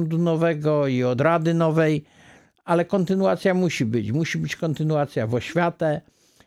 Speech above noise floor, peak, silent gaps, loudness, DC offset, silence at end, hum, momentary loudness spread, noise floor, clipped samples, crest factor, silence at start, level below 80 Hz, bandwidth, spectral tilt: 30 dB; -8 dBFS; none; -22 LUFS; under 0.1%; 0.45 s; none; 6 LU; -51 dBFS; under 0.1%; 16 dB; 0 s; -62 dBFS; 13 kHz; -7 dB/octave